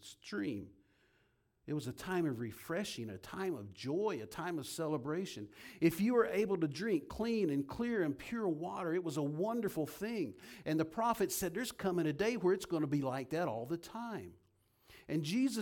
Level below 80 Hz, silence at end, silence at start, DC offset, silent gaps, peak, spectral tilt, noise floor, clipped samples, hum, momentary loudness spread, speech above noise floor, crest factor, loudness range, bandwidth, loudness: -68 dBFS; 0 s; 0 s; under 0.1%; none; -18 dBFS; -5.5 dB/octave; -75 dBFS; under 0.1%; none; 10 LU; 39 dB; 20 dB; 5 LU; 18 kHz; -37 LUFS